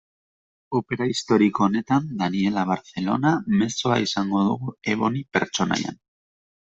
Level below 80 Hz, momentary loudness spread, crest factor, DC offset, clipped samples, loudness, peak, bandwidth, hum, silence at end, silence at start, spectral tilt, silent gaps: -60 dBFS; 7 LU; 20 dB; under 0.1%; under 0.1%; -23 LUFS; -4 dBFS; 8 kHz; none; 0.85 s; 0.7 s; -5.5 dB/octave; none